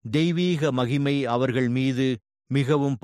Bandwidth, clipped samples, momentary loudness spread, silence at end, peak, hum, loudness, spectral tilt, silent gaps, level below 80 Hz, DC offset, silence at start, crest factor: 11 kHz; under 0.1%; 4 LU; 0.05 s; -10 dBFS; none; -24 LUFS; -7 dB/octave; none; -60 dBFS; under 0.1%; 0.05 s; 14 dB